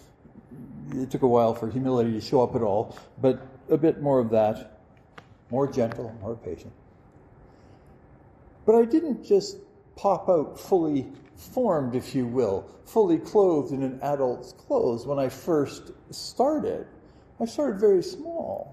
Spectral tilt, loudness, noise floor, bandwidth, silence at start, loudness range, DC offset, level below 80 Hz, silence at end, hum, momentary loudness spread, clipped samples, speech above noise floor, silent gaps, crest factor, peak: -7 dB/octave; -25 LUFS; -53 dBFS; 14.5 kHz; 0.35 s; 5 LU; under 0.1%; -60 dBFS; 0 s; none; 15 LU; under 0.1%; 29 dB; none; 18 dB; -8 dBFS